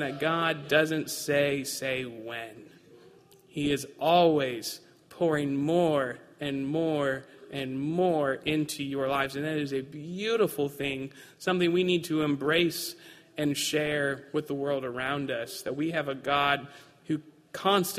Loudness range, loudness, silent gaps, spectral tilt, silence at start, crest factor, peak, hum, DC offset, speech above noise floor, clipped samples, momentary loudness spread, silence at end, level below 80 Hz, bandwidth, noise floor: 3 LU; -29 LUFS; none; -4.5 dB/octave; 0 s; 20 dB; -10 dBFS; none; under 0.1%; 28 dB; under 0.1%; 12 LU; 0 s; -64 dBFS; 15.5 kHz; -56 dBFS